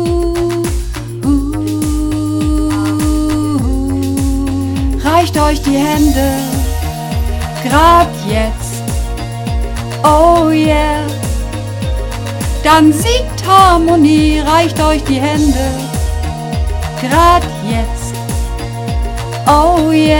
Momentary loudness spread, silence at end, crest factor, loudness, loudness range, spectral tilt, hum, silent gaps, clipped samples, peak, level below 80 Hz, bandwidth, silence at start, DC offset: 11 LU; 0 s; 12 dB; -13 LUFS; 5 LU; -5.5 dB/octave; none; none; 0.4%; 0 dBFS; -20 dBFS; 18.5 kHz; 0 s; under 0.1%